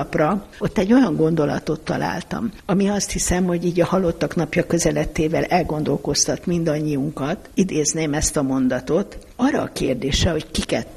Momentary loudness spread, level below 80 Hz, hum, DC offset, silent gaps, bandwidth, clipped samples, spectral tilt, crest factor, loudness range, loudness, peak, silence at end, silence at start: 6 LU; -36 dBFS; none; under 0.1%; none; 14 kHz; under 0.1%; -4.5 dB/octave; 16 dB; 1 LU; -21 LUFS; -4 dBFS; 0 s; 0 s